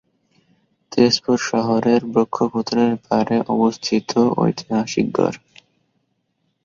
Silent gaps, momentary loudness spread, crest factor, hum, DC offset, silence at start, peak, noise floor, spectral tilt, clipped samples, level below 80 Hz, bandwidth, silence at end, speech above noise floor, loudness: none; 5 LU; 18 dB; none; under 0.1%; 0.9 s; -2 dBFS; -70 dBFS; -5.5 dB/octave; under 0.1%; -58 dBFS; 7.6 kHz; 1.3 s; 52 dB; -19 LUFS